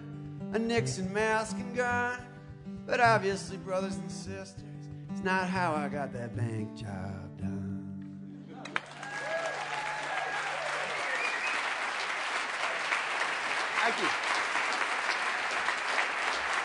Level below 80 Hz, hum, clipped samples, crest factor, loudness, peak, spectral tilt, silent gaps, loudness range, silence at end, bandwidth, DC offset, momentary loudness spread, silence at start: -64 dBFS; none; under 0.1%; 22 dB; -31 LUFS; -12 dBFS; -4 dB/octave; none; 7 LU; 0 s; 11 kHz; under 0.1%; 13 LU; 0 s